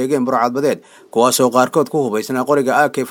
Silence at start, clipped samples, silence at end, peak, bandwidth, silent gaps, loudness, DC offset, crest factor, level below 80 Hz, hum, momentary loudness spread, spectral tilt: 0 s; under 0.1%; 0 s; 0 dBFS; 19.5 kHz; none; -16 LUFS; under 0.1%; 16 dB; -66 dBFS; none; 6 LU; -4 dB/octave